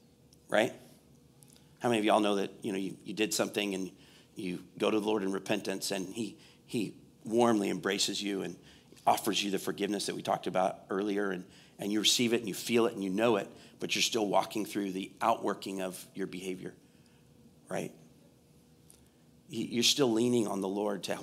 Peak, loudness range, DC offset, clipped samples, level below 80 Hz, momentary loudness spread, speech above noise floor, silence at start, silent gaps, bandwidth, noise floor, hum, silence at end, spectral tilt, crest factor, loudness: -10 dBFS; 7 LU; under 0.1%; under 0.1%; -74 dBFS; 13 LU; 30 dB; 0.5 s; none; 16 kHz; -62 dBFS; none; 0 s; -3.5 dB/octave; 22 dB; -32 LUFS